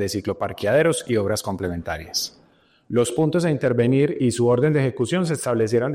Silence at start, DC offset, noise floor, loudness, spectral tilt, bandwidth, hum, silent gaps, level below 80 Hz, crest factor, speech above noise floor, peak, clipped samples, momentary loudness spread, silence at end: 0 s; under 0.1%; -58 dBFS; -21 LUFS; -5.5 dB/octave; 16 kHz; none; none; -54 dBFS; 14 dB; 37 dB; -6 dBFS; under 0.1%; 8 LU; 0 s